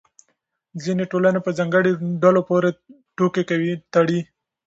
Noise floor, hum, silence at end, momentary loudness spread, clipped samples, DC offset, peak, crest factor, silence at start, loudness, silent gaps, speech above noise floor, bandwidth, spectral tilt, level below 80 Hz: -71 dBFS; none; 0.45 s; 11 LU; under 0.1%; under 0.1%; -2 dBFS; 18 dB; 0.75 s; -20 LUFS; none; 52 dB; 8 kHz; -7 dB/octave; -66 dBFS